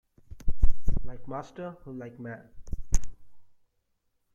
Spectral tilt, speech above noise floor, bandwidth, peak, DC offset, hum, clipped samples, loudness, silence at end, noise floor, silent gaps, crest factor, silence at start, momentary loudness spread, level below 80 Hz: -6 dB/octave; 36 dB; 8.8 kHz; -6 dBFS; under 0.1%; none; under 0.1%; -38 LUFS; 0.95 s; -75 dBFS; none; 18 dB; 0.35 s; 12 LU; -32 dBFS